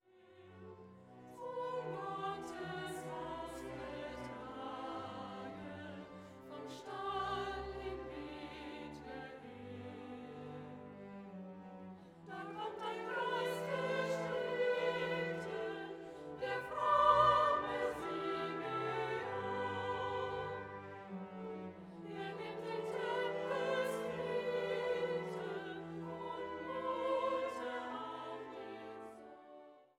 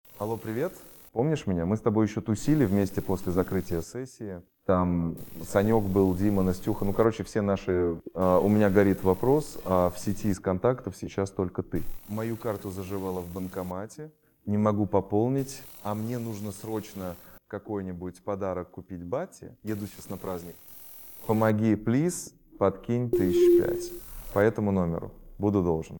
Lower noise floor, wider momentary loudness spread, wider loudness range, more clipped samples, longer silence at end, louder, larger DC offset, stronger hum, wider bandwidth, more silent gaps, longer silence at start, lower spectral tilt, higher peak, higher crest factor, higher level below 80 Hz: first, -62 dBFS vs -46 dBFS; about the same, 15 LU vs 15 LU; first, 13 LU vs 10 LU; neither; first, 0.15 s vs 0 s; second, -40 LUFS vs -28 LUFS; neither; neither; second, 16 kHz vs 18.5 kHz; neither; about the same, 0.15 s vs 0.1 s; second, -5.5 dB/octave vs -7.5 dB/octave; second, -16 dBFS vs -8 dBFS; about the same, 24 dB vs 20 dB; second, -68 dBFS vs -50 dBFS